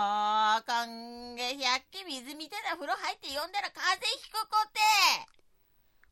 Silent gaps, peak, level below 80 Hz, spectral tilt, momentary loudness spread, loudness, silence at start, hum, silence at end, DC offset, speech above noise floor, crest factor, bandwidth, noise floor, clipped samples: none; -10 dBFS; -72 dBFS; 0.5 dB/octave; 15 LU; -30 LUFS; 0 s; none; 0.85 s; under 0.1%; 35 dB; 22 dB; 16.5 kHz; -66 dBFS; under 0.1%